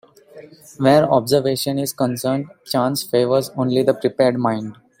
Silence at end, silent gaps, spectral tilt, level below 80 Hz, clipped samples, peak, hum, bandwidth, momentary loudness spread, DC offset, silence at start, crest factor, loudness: 0.25 s; none; -5.5 dB/octave; -60 dBFS; under 0.1%; -2 dBFS; none; 16.5 kHz; 8 LU; under 0.1%; 0.35 s; 16 dB; -19 LUFS